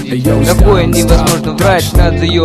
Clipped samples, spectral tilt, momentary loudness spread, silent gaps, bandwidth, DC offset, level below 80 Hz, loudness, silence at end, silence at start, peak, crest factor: 0.2%; -5.5 dB/octave; 3 LU; none; 14.5 kHz; under 0.1%; -14 dBFS; -10 LUFS; 0 s; 0 s; 0 dBFS; 8 dB